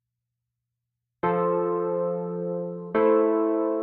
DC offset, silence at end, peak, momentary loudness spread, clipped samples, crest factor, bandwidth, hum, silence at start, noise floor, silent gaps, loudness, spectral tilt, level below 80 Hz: under 0.1%; 0 s; -10 dBFS; 9 LU; under 0.1%; 16 dB; 3.9 kHz; none; 1.25 s; -84 dBFS; none; -25 LUFS; -11.5 dB/octave; -70 dBFS